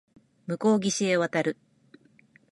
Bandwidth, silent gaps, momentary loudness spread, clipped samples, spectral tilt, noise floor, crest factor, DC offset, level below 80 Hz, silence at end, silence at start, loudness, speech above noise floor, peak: 11.5 kHz; none; 17 LU; under 0.1%; -4.5 dB/octave; -60 dBFS; 16 dB; under 0.1%; -74 dBFS; 1 s; 0.5 s; -26 LUFS; 35 dB; -12 dBFS